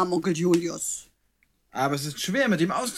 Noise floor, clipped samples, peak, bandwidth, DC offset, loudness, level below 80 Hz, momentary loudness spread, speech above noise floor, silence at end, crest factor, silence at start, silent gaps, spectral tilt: -69 dBFS; under 0.1%; -10 dBFS; 15.5 kHz; under 0.1%; -25 LUFS; -64 dBFS; 8 LU; 44 dB; 0 s; 16 dB; 0 s; none; -4.5 dB/octave